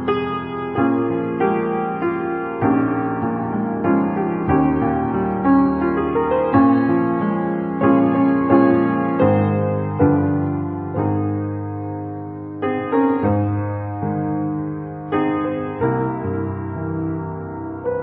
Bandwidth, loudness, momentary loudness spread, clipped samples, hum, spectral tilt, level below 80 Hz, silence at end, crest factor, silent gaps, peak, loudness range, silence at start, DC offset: 4.4 kHz; -20 LUFS; 10 LU; under 0.1%; none; -13 dB/octave; -42 dBFS; 0 s; 18 dB; none; -2 dBFS; 6 LU; 0 s; under 0.1%